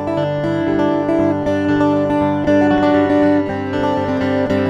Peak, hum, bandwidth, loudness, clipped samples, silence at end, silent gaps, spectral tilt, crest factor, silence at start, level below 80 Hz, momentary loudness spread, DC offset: -4 dBFS; none; 7.4 kHz; -16 LUFS; under 0.1%; 0 s; none; -8 dB/octave; 12 dB; 0 s; -44 dBFS; 5 LU; under 0.1%